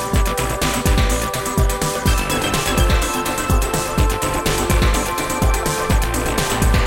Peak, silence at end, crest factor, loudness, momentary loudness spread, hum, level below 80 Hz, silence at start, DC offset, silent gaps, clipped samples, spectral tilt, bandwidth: -2 dBFS; 0 s; 16 dB; -18 LUFS; 3 LU; none; -22 dBFS; 0 s; under 0.1%; none; under 0.1%; -4 dB/octave; 17 kHz